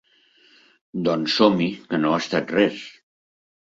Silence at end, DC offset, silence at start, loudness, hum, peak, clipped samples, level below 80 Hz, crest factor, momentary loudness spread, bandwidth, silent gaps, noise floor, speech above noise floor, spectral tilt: 0.9 s; under 0.1%; 0.95 s; -21 LUFS; none; -2 dBFS; under 0.1%; -64 dBFS; 22 dB; 15 LU; 7.8 kHz; none; -58 dBFS; 37 dB; -5.5 dB/octave